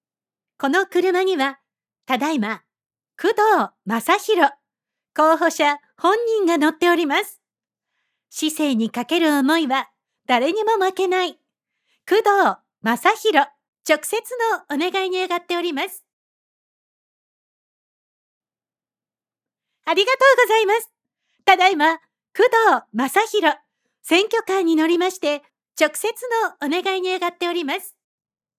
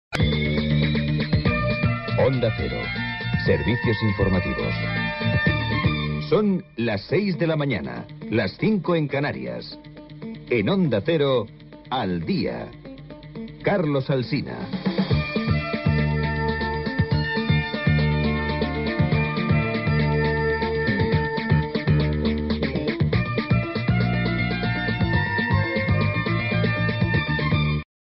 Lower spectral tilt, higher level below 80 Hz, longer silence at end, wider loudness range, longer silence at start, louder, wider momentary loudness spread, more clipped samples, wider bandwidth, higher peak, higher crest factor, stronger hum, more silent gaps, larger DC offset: second, -2.5 dB/octave vs -5.5 dB/octave; second, -86 dBFS vs -36 dBFS; first, 0.7 s vs 0.25 s; about the same, 5 LU vs 3 LU; first, 0.6 s vs 0.1 s; first, -19 LUFS vs -23 LUFS; first, 11 LU vs 6 LU; neither; first, 16 kHz vs 5.8 kHz; first, 0 dBFS vs -8 dBFS; about the same, 20 dB vs 16 dB; neither; first, 13.68-13.73 s, 16.13-18.41 s vs none; neither